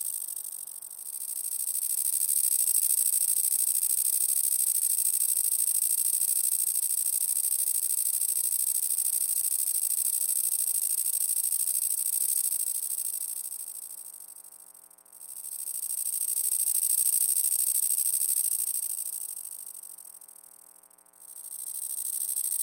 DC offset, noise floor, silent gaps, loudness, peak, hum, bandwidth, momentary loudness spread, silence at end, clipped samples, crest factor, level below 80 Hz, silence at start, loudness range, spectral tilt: under 0.1%; -57 dBFS; none; -25 LUFS; -8 dBFS; none; 17 kHz; 15 LU; 0 s; under 0.1%; 20 dB; under -90 dBFS; 0 s; 10 LU; 5 dB/octave